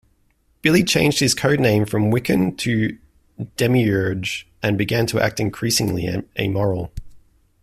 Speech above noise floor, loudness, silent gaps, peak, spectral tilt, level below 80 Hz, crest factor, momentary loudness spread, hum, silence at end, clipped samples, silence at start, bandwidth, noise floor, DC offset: 43 dB; -19 LUFS; none; -2 dBFS; -5 dB/octave; -46 dBFS; 18 dB; 9 LU; none; 0.45 s; under 0.1%; 0.65 s; 15.5 kHz; -62 dBFS; under 0.1%